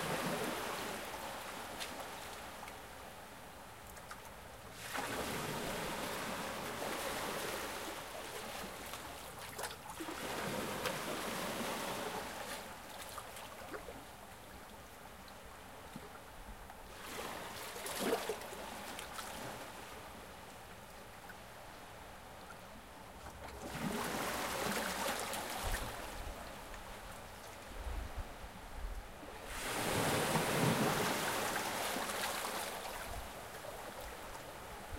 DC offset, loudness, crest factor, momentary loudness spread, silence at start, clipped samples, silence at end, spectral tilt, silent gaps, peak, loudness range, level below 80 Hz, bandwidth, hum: under 0.1%; -41 LUFS; 24 dB; 15 LU; 0 s; under 0.1%; 0 s; -3 dB/octave; none; -20 dBFS; 14 LU; -56 dBFS; 16.5 kHz; none